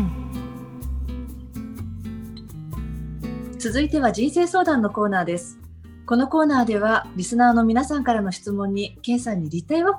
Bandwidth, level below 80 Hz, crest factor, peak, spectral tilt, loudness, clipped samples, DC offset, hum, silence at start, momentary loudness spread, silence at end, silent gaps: 19 kHz; -38 dBFS; 18 dB; -4 dBFS; -5.5 dB/octave; -22 LUFS; under 0.1%; under 0.1%; none; 0 s; 16 LU; 0 s; none